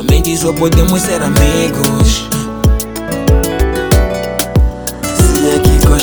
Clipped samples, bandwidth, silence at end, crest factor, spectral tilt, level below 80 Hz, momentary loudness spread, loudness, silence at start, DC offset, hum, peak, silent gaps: 0.1%; over 20 kHz; 0 s; 10 dB; -5 dB/octave; -14 dBFS; 6 LU; -12 LUFS; 0 s; under 0.1%; none; 0 dBFS; none